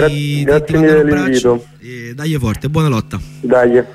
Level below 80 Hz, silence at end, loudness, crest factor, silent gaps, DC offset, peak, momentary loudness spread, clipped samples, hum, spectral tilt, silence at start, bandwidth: -36 dBFS; 0 s; -14 LUFS; 12 dB; none; under 0.1%; 0 dBFS; 14 LU; under 0.1%; none; -6.5 dB/octave; 0 s; 15 kHz